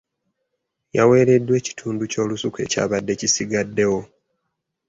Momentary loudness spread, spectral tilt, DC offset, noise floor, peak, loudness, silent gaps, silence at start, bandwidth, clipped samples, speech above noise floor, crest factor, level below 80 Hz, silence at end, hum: 11 LU; -4.5 dB/octave; under 0.1%; -77 dBFS; -4 dBFS; -20 LUFS; none; 0.95 s; 8 kHz; under 0.1%; 58 dB; 18 dB; -56 dBFS; 0.85 s; none